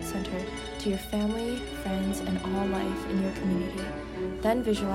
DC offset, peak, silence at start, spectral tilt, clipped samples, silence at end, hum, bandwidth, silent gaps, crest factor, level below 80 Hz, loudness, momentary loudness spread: under 0.1%; -14 dBFS; 0 s; -6 dB/octave; under 0.1%; 0 s; none; 16 kHz; none; 16 dB; -44 dBFS; -30 LUFS; 7 LU